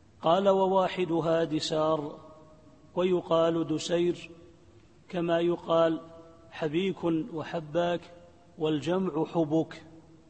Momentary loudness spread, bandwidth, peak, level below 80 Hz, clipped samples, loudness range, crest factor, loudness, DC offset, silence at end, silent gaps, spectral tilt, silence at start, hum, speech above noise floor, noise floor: 12 LU; 8.8 kHz; -10 dBFS; -64 dBFS; under 0.1%; 3 LU; 18 dB; -28 LUFS; under 0.1%; 0.3 s; none; -6 dB/octave; 0.2 s; none; 30 dB; -57 dBFS